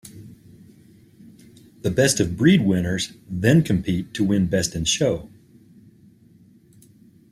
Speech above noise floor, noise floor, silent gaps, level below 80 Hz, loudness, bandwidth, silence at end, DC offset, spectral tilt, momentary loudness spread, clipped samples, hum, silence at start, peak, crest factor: 33 dB; -52 dBFS; none; -48 dBFS; -21 LUFS; 14.5 kHz; 2.05 s; under 0.1%; -5 dB/octave; 10 LU; under 0.1%; none; 0.05 s; -4 dBFS; 20 dB